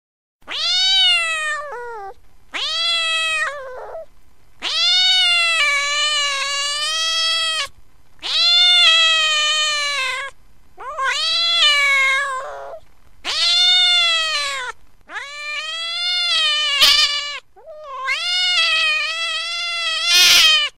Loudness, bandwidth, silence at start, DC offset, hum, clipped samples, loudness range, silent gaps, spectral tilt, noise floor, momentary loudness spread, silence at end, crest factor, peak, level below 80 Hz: -14 LUFS; 16 kHz; 0.45 s; 0.9%; none; under 0.1%; 4 LU; none; 3 dB/octave; -51 dBFS; 19 LU; 0.1 s; 18 dB; 0 dBFS; -54 dBFS